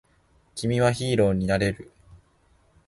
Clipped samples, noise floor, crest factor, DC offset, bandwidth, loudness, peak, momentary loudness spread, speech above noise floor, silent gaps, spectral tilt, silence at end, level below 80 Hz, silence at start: under 0.1%; -62 dBFS; 18 dB; under 0.1%; 11.5 kHz; -24 LUFS; -8 dBFS; 13 LU; 39 dB; none; -6 dB/octave; 0.7 s; -48 dBFS; 0.55 s